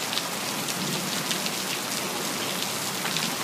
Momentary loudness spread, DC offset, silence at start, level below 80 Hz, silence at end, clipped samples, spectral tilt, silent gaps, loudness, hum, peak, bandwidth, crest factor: 2 LU; under 0.1%; 0 s; -72 dBFS; 0 s; under 0.1%; -2 dB/octave; none; -27 LUFS; none; -6 dBFS; 16 kHz; 24 dB